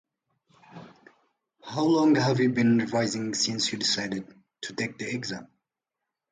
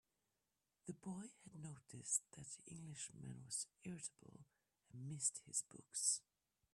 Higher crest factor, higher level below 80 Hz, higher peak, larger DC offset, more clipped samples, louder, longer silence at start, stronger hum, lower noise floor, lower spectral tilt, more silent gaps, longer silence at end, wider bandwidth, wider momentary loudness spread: second, 16 dB vs 28 dB; first, -68 dBFS vs -84 dBFS; first, -12 dBFS vs -24 dBFS; neither; neither; first, -26 LUFS vs -46 LUFS; about the same, 0.75 s vs 0.85 s; neither; about the same, -87 dBFS vs under -90 dBFS; first, -4.5 dB/octave vs -2.5 dB/octave; neither; first, 0.85 s vs 0.55 s; second, 9.6 kHz vs 14.5 kHz; about the same, 14 LU vs 16 LU